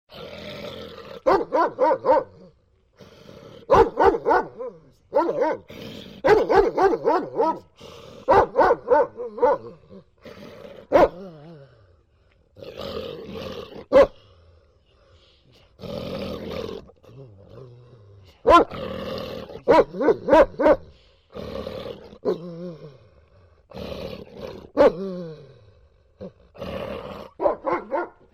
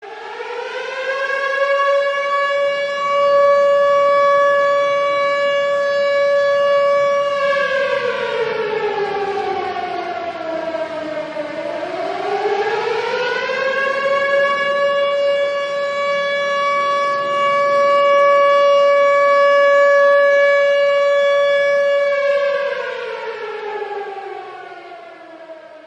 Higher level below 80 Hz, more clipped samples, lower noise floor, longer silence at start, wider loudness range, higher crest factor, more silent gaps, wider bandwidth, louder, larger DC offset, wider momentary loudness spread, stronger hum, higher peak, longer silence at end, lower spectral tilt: first, -46 dBFS vs -66 dBFS; neither; first, -60 dBFS vs -37 dBFS; about the same, 0.1 s vs 0 s; first, 12 LU vs 9 LU; first, 20 dB vs 12 dB; neither; first, 15 kHz vs 8.4 kHz; second, -21 LUFS vs -16 LUFS; neither; first, 23 LU vs 13 LU; neither; about the same, -2 dBFS vs -4 dBFS; first, 0.25 s vs 0.1 s; first, -6.5 dB/octave vs -3 dB/octave